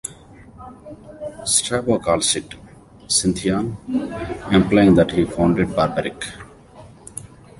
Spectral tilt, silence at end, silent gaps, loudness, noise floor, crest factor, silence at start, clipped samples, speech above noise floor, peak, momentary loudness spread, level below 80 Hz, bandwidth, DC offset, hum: -4.5 dB/octave; 0.35 s; none; -19 LUFS; -44 dBFS; 20 dB; 0.05 s; under 0.1%; 25 dB; 0 dBFS; 24 LU; -42 dBFS; 11.5 kHz; under 0.1%; none